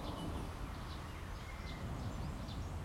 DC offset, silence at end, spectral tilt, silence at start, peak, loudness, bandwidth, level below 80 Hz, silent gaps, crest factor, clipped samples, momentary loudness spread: under 0.1%; 0 s; -6 dB/octave; 0 s; -32 dBFS; -45 LUFS; 16.5 kHz; -48 dBFS; none; 12 dB; under 0.1%; 4 LU